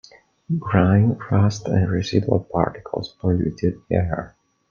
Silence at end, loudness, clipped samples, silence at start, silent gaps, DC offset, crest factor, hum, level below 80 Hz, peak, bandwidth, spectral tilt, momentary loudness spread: 0.45 s; -21 LUFS; under 0.1%; 0.5 s; none; under 0.1%; 20 dB; none; -46 dBFS; -2 dBFS; 7.2 kHz; -7.5 dB/octave; 10 LU